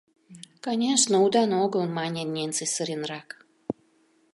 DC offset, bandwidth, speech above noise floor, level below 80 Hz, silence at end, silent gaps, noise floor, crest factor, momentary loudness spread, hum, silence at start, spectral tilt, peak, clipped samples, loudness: under 0.1%; 11.5 kHz; 39 dB; -74 dBFS; 0.6 s; none; -64 dBFS; 22 dB; 17 LU; none; 0.3 s; -3.5 dB/octave; -6 dBFS; under 0.1%; -25 LUFS